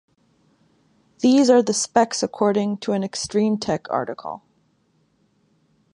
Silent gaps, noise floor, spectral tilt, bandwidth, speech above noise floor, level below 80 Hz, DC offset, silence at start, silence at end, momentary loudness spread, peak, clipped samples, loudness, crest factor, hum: none; -64 dBFS; -4.5 dB/octave; 11 kHz; 44 dB; -62 dBFS; under 0.1%; 1.2 s; 1.55 s; 13 LU; -4 dBFS; under 0.1%; -20 LUFS; 20 dB; none